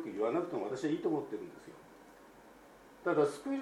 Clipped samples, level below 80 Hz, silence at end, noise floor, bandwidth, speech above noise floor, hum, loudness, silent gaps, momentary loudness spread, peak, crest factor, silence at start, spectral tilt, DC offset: under 0.1%; -74 dBFS; 0 s; -58 dBFS; 15 kHz; 23 dB; none; -35 LUFS; none; 24 LU; -18 dBFS; 18 dB; 0 s; -6.5 dB/octave; under 0.1%